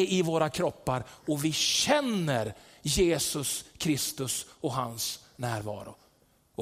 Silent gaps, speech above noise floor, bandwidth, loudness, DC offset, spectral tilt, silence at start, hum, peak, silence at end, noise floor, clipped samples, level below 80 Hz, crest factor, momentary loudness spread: none; 36 dB; 16 kHz; -29 LUFS; under 0.1%; -3.5 dB/octave; 0 s; none; -12 dBFS; 0 s; -65 dBFS; under 0.1%; -52 dBFS; 18 dB; 11 LU